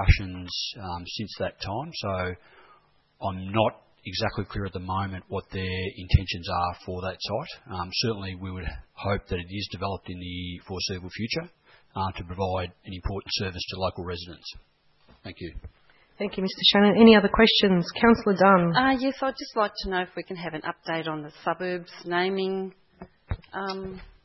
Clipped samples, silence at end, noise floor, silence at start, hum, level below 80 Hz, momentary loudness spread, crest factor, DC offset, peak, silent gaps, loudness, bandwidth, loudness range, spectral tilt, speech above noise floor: under 0.1%; 0.15 s; -60 dBFS; 0 s; none; -40 dBFS; 18 LU; 22 dB; under 0.1%; -4 dBFS; none; -26 LUFS; 6 kHz; 13 LU; -6 dB/octave; 34 dB